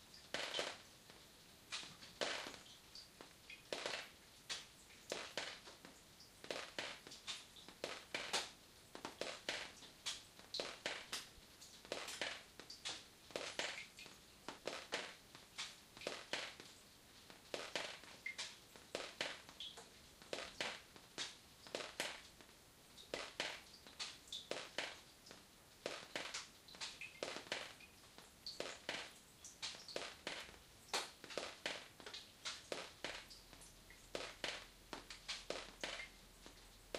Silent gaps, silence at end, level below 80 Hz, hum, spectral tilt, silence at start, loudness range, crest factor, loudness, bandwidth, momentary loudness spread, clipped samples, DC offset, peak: none; 0 s; -74 dBFS; none; -1 dB/octave; 0 s; 2 LU; 28 dB; -48 LUFS; 15.5 kHz; 15 LU; under 0.1%; under 0.1%; -22 dBFS